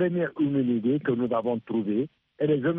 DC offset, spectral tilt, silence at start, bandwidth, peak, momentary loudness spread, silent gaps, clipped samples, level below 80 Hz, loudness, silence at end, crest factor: under 0.1%; -11 dB/octave; 0 s; 3.8 kHz; -14 dBFS; 5 LU; none; under 0.1%; -70 dBFS; -27 LUFS; 0 s; 12 dB